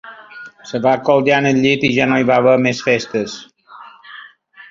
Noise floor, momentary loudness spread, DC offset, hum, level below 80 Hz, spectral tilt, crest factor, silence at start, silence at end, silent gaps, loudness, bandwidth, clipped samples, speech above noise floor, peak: -42 dBFS; 23 LU; under 0.1%; none; -56 dBFS; -5.5 dB/octave; 16 dB; 0.05 s; 0.1 s; none; -15 LUFS; 7.6 kHz; under 0.1%; 27 dB; -2 dBFS